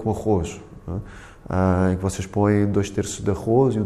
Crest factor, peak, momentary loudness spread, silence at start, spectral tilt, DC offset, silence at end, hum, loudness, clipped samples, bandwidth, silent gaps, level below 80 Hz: 14 dB; -8 dBFS; 14 LU; 0 s; -7 dB/octave; under 0.1%; 0 s; none; -22 LUFS; under 0.1%; 13 kHz; none; -42 dBFS